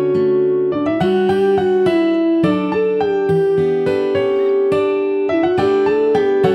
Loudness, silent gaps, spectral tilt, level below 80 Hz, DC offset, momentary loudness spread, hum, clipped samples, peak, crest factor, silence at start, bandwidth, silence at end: -16 LUFS; none; -8 dB/octave; -52 dBFS; under 0.1%; 2 LU; none; under 0.1%; -4 dBFS; 12 dB; 0 s; 8.6 kHz; 0 s